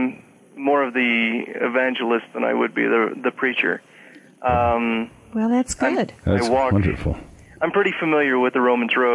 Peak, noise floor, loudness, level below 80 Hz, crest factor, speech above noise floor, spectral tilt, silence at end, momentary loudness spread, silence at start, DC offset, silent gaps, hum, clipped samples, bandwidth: -8 dBFS; -41 dBFS; -21 LUFS; -44 dBFS; 14 dB; 21 dB; -5.5 dB/octave; 0 s; 8 LU; 0 s; under 0.1%; none; none; under 0.1%; 11.5 kHz